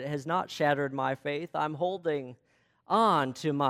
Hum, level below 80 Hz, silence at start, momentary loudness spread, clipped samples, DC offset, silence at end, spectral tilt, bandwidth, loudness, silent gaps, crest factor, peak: none; -74 dBFS; 0 s; 8 LU; under 0.1%; under 0.1%; 0 s; -6 dB/octave; 15.5 kHz; -29 LUFS; none; 18 dB; -12 dBFS